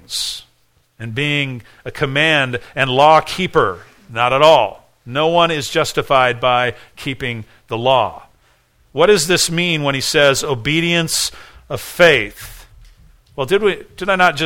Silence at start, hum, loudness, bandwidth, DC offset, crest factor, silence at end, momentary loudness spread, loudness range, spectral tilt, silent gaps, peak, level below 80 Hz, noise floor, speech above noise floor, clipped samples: 0.1 s; none; -15 LUFS; 17.5 kHz; under 0.1%; 16 dB; 0 s; 16 LU; 3 LU; -3.5 dB/octave; none; 0 dBFS; -46 dBFS; -58 dBFS; 42 dB; under 0.1%